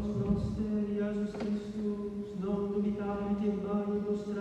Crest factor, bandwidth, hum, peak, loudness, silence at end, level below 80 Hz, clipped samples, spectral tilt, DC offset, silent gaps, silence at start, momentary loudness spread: 14 dB; 8.2 kHz; none; -18 dBFS; -34 LUFS; 0 s; -50 dBFS; under 0.1%; -9 dB/octave; under 0.1%; none; 0 s; 4 LU